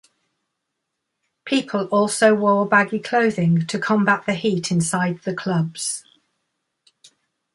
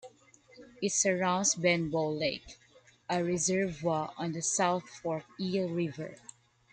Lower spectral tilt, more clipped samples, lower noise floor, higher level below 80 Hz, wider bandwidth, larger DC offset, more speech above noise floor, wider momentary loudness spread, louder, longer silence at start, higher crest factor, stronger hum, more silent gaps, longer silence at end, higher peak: first, -5 dB/octave vs -3.5 dB/octave; neither; first, -79 dBFS vs -60 dBFS; about the same, -64 dBFS vs -66 dBFS; first, 11.5 kHz vs 10 kHz; neither; first, 59 dB vs 29 dB; about the same, 8 LU vs 9 LU; first, -20 LUFS vs -31 LUFS; first, 1.45 s vs 0.05 s; about the same, 18 dB vs 20 dB; neither; neither; first, 1.55 s vs 0.6 s; first, -4 dBFS vs -14 dBFS